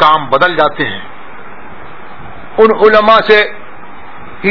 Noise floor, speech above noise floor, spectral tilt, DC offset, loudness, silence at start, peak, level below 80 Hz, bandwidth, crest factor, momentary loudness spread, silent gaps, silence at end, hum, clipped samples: -32 dBFS; 24 dB; -6 dB/octave; 6%; -9 LUFS; 0 s; 0 dBFS; -44 dBFS; 5.4 kHz; 12 dB; 25 LU; none; 0 s; none; 1%